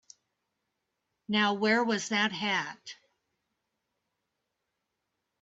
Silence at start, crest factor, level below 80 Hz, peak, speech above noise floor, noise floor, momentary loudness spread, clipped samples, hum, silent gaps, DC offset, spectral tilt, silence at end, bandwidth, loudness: 1.3 s; 20 dB; -80 dBFS; -14 dBFS; 55 dB; -84 dBFS; 15 LU; under 0.1%; none; none; under 0.1%; -3.5 dB/octave; 2.45 s; 8 kHz; -28 LUFS